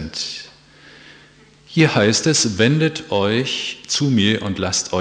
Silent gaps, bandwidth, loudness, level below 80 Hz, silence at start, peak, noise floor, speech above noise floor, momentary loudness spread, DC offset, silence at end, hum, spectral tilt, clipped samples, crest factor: none; 10 kHz; -18 LUFS; -52 dBFS; 0 s; -2 dBFS; -49 dBFS; 31 dB; 10 LU; under 0.1%; 0 s; none; -4 dB/octave; under 0.1%; 18 dB